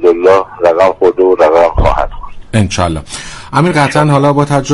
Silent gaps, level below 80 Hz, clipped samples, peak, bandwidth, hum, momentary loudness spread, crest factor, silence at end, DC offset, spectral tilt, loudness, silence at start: none; -24 dBFS; 0.3%; 0 dBFS; 11.5 kHz; none; 9 LU; 10 dB; 0 s; under 0.1%; -6 dB/octave; -10 LUFS; 0 s